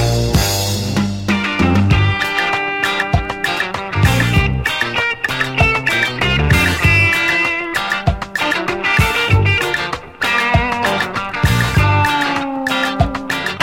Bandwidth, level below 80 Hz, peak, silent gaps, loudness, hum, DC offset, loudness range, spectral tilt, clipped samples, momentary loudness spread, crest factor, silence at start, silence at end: 16.5 kHz; -28 dBFS; 0 dBFS; none; -15 LUFS; none; under 0.1%; 2 LU; -4.5 dB/octave; under 0.1%; 6 LU; 16 dB; 0 s; 0 s